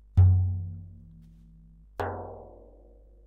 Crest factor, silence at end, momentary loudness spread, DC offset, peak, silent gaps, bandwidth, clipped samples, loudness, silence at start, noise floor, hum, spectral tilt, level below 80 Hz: 18 dB; 0.8 s; 26 LU; under 0.1%; -10 dBFS; none; 3.6 kHz; under 0.1%; -27 LUFS; 0.15 s; -53 dBFS; 50 Hz at -55 dBFS; -10 dB/octave; -42 dBFS